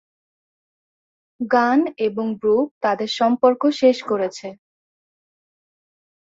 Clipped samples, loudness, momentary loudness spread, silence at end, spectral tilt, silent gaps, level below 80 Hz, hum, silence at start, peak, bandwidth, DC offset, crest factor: under 0.1%; -19 LUFS; 9 LU; 1.65 s; -5 dB/octave; 2.71-2.81 s; -68 dBFS; none; 1.4 s; -2 dBFS; 7.8 kHz; under 0.1%; 20 dB